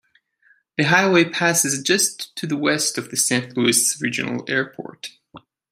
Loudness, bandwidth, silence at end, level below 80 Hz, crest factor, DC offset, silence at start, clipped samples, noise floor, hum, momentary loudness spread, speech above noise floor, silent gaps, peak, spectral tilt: -19 LUFS; 16 kHz; 0.35 s; -66 dBFS; 20 dB; under 0.1%; 0.8 s; under 0.1%; -60 dBFS; none; 14 LU; 39 dB; none; 0 dBFS; -2.5 dB/octave